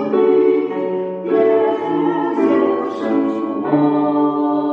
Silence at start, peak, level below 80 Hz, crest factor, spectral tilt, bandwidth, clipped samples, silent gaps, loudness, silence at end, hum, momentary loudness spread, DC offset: 0 s; -2 dBFS; -76 dBFS; 14 dB; -8.5 dB/octave; 5.4 kHz; under 0.1%; none; -17 LUFS; 0 s; none; 6 LU; under 0.1%